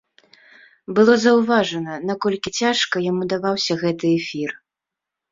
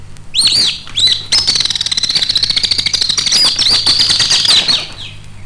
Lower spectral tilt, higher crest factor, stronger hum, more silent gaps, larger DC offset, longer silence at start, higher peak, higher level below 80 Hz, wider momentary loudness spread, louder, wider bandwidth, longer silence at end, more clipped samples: first, -4.5 dB/octave vs 0 dB/octave; first, 18 dB vs 12 dB; neither; neither; second, under 0.1% vs 0.2%; first, 0.9 s vs 0 s; about the same, -2 dBFS vs 0 dBFS; second, -62 dBFS vs -36 dBFS; first, 11 LU vs 5 LU; second, -19 LUFS vs -9 LUFS; second, 7.8 kHz vs 10.5 kHz; first, 0.75 s vs 0 s; neither